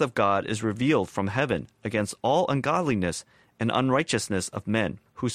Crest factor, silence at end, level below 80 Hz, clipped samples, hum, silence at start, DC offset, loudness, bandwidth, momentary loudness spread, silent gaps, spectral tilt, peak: 16 dB; 0 s; -56 dBFS; under 0.1%; none; 0 s; under 0.1%; -26 LUFS; 15 kHz; 7 LU; none; -5 dB/octave; -10 dBFS